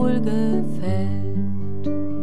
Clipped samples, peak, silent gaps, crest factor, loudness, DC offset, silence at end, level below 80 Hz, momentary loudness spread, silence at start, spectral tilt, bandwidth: under 0.1%; -8 dBFS; none; 12 dB; -24 LUFS; 10%; 0 s; -56 dBFS; 6 LU; 0 s; -9 dB/octave; 10.5 kHz